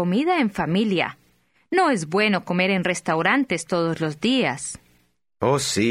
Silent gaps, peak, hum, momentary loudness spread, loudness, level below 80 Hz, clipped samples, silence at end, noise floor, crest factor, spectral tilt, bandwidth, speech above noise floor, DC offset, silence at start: none; -4 dBFS; none; 5 LU; -22 LUFS; -58 dBFS; under 0.1%; 0 s; -64 dBFS; 18 dB; -4.5 dB/octave; 15 kHz; 43 dB; under 0.1%; 0 s